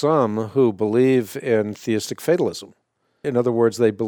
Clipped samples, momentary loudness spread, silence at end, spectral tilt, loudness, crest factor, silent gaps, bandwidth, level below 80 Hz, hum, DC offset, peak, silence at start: under 0.1%; 6 LU; 0 s; -6.5 dB/octave; -20 LUFS; 16 dB; none; 18.5 kHz; -66 dBFS; none; under 0.1%; -4 dBFS; 0 s